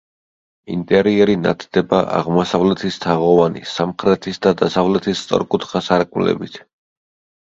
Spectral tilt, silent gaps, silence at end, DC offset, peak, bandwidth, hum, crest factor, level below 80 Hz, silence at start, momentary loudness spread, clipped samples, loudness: -6.5 dB/octave; none; 0.85 s; under 0.1%; 0 dBFS; 7.8 kHz; none; 18 dB; -50 dBFS; 0.7 s; 7 LU; under 0.1%; -17 LUFS